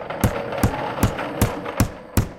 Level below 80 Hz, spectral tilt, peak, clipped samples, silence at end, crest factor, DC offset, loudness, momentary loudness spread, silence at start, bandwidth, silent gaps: -32 dBFS; -5.5 dB/octave; -6 dBFS; under 0.1%; 0 s; 18 dB; under 0.1%; -23 LUFS; 1 LU; 0 s; 17 kHz; none